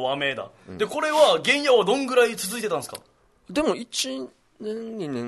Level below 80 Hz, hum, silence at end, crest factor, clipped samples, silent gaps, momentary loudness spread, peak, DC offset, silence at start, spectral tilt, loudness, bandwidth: -62 dBFS; none; 0 s; 20 dB; under 0.1%; none; 18 LU; -4 dBFS; under 0.1%; 0 s; -3 dB/octave; -23 LUFS; 12.5 kHz